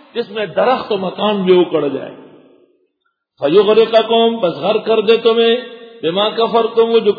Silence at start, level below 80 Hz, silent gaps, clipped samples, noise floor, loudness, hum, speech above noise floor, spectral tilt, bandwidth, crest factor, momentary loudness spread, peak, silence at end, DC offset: 0.15 s; -66 dBFS; none; under 0.1%; -69 dBFS; -14 LUFS; none; 55 dB; -7.5 dB/octave; 5 kHz; 14 dB; 10 LU; 0 dBFS; 0 s; under 0.1%